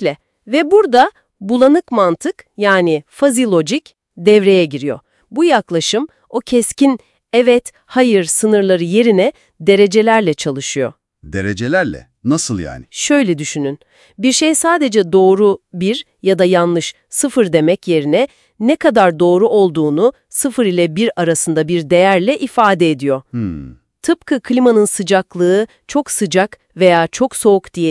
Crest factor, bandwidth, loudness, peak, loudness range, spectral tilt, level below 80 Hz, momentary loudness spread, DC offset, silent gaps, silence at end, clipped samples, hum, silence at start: 14 dB; 12 kHz; -14 LUFS; 0 dBFS; 2 LU; -4.5 dB/octave; -52 dBFS; 10 LU; under 0.1%; none; 0 s; under 0.1%; none; 0 s